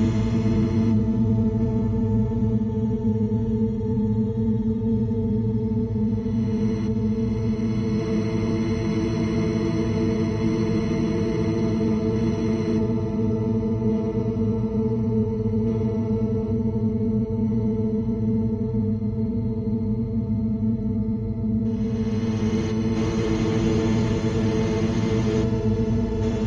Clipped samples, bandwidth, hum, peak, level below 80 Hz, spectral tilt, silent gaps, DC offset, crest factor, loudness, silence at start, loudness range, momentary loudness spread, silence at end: under 0.1%; 7.2 kHz; none; -10 dBFS; -36 dBFS; -8.5 dB/octave; none; under 0.1%; 14 dB; -24 LUFS; 0 s; 2 LU; 3 LU; 0 s